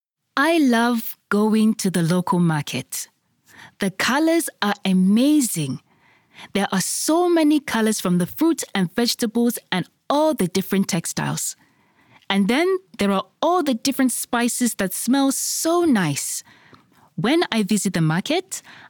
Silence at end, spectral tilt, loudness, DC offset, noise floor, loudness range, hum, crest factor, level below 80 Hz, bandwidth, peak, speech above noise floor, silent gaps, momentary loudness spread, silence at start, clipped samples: 0.15 s; -4.5 dB/octave; -20 LUFS; under 0.1%; -58 dBFS; 2 LU; none; 18 dB; -62 dBFS; 19 kHz; -2 dBFS; 38 dB; none; 9 LU; 0.35 s; under 0.1%